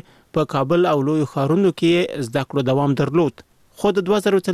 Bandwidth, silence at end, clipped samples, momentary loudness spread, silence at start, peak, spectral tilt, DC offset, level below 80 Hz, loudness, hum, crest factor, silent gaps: 14.5 kHz; 0 s; under 0.1%; 6 LU; 0.35 s; -6 dBFS; -7 dB/octave; 0.1%; -54 dBFS; -19 LUFS; none; 12 dB; none